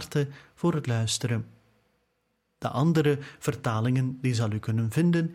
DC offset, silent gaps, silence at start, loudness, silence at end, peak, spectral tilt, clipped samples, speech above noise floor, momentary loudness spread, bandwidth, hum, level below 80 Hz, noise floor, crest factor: under 0.1%; none; 0 s; -27 LUFS; 0 s; -12 dBFS; -6 dB/octave; under 0.1%; 49 dB; 8 LU; 15.5 kHz; none; -60 dBFS; -75 dBFS; 16 dB